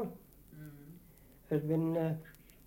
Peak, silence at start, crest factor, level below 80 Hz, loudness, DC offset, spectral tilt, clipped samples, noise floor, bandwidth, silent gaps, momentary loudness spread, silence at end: -20 dBFS; 0 s; 18 dB; -64 dBFS; -35 LUFS; under 0.1%; -9 dB/octave; under 0.1%; -60 dBFS; 17 kHz; none; 24 LU; 0.35 s